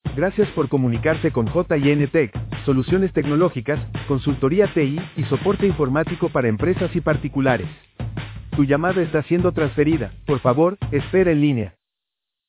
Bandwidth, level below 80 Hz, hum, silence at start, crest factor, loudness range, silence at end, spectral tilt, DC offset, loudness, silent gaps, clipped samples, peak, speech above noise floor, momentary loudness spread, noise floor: 4 kHz; -40 dBFS; none; 0.05 s; 18 dB; 2 LU; 0.8 s; -12 dB/octave; under 0.1%; -20 LUFS; none; under 0.1%; -2 dBFS; 64 dB; 7 LU; -84 dBFS